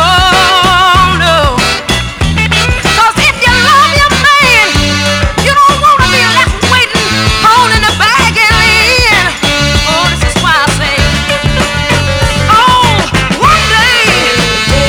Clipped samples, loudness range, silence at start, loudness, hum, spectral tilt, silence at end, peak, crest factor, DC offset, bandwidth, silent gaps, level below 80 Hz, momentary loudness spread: 2%; 2 LU; 0 s; -6 LUFS; none; -3 dB/octave; 0 s; 0 dBFS; 8 dB; under 0.1%; over 20 kHz; none; -20 dBFS; 5 LU